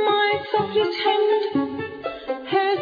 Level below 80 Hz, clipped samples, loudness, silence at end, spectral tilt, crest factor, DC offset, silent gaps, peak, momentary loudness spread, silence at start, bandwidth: -62 dBFS; under 0.1%; -22 LUFS; 0 s; -6.5 dB/octave; 14 dB; under 0.1%; none; -8 dBFS; 11 LU; 0 s; 5 kHz